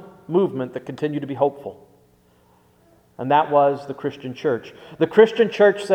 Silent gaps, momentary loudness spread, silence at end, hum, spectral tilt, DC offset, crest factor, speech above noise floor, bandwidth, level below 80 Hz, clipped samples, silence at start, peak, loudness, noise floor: none; 14 LU; 0 s; none; -6.5 dB/octave; under 0.1%; 20 dB; 37 dB; 9.8 kHz; -66 dBFS; under 0.1%; 0 s; 0 dBFS; -20 LUFS; -57 dBFS